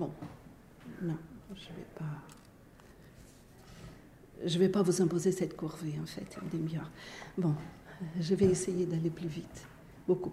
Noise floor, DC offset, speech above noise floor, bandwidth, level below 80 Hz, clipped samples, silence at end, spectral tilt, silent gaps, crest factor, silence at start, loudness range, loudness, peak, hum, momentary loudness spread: -57 dBFS; under 0.1%; 24 dB; 15.5 kHz; -60 dBFS; under 0.1%; 0 s; -6.5 dB/octave; none; 20 dB; 0 s; 12 LU; -34 LUFS; -14 dBFS; none; 23 LU